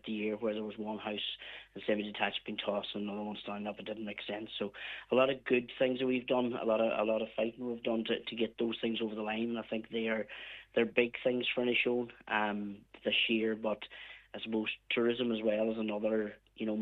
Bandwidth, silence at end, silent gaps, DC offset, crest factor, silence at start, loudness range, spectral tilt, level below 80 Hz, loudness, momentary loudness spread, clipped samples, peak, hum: 4.6 kHz; 0 s; none; under 0.1%; 20 dB; 0.05 s; 5 LU; -7 dB/octave; -72 dBFS; -34 LUFS; 10 LU; under 0.1%; -14 dBFS; none